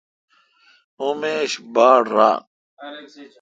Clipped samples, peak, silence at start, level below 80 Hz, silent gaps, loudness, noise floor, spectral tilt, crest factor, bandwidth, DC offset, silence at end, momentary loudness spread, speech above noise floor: under 0.1%; 0 dBFS; 1 s; -74 dBFS; 2.47-2.77 s; -18 LUFS; -57 dBFS; -3.5 dB/octave; 20 dB; 9 kHz; under 0.1%; 0.15 s; 23 LU; 38 dB